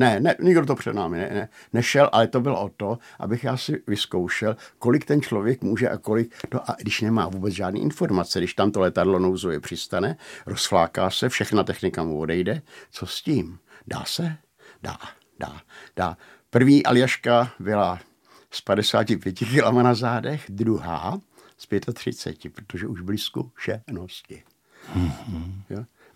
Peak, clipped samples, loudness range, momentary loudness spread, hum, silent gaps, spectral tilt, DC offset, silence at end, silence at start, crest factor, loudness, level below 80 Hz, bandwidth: -2 dBFS; under 0.1%; 9 LU; 17 LU; none; none; -5.5 dB/octave; under 0.1%; 0.3 s; 0 s; 22 dB; -23 LUFS; -54 dBFS; 16.5 kHz